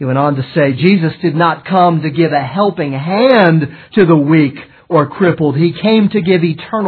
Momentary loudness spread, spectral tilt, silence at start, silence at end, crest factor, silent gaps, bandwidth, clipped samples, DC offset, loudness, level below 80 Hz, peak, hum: 6 LU; -10.5 dB/octave; 0 s; 0 s; 12 dB; none; 4.6 kHz; under 0.1%; under 0.1%; -12 LUFS; -56 dBFS; 0 dBFS; none